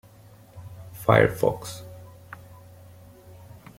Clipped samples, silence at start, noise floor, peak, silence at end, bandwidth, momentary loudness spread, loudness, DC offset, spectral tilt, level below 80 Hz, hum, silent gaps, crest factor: under 0.1%; 0.55 s; -51 dBFS; -2 dBFS; 1.85 s; 16.5 kHz; 27 LU; -22 LUFS; under 0.1%; -6 dB/octave; -54 dBFS; none; none; 26 dB